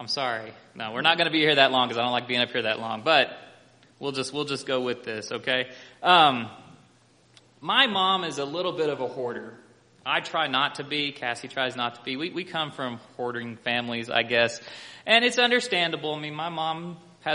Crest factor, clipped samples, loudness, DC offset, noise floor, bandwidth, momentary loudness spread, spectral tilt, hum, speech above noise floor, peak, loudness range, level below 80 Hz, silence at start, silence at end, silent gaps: 24 dB; under 0.1%; -25 LUFS; under 0.1%; -59 dBFS; 10.5 kHz; 15 LU; -3.5 dB/octave; none; 33 dB; -2 dBFS; 5 LU; -72 dBFS; 0 s; 0 s; none